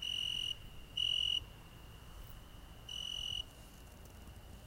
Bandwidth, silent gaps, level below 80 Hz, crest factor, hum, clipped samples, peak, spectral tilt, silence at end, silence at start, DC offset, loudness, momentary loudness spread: 16 kHz; none; -56 dBFS; 18 dB; none; under 0.1%; -26 dBFS; -1.5 dB/octave; 0 s; 0 s; under 0.1%; -37 LUFS; 22 LU